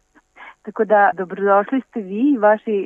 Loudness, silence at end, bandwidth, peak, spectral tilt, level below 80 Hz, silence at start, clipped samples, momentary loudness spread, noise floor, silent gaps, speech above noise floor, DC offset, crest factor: -17 LUFS; 0 s; 3.7 kHz; -2 dBFS; -8.5 dB/octave; -70 dBFS; 0.4 s; under 0.1%; 12 LU; -44 dBFS; none; 27 dB; under 0.1%; 16 dB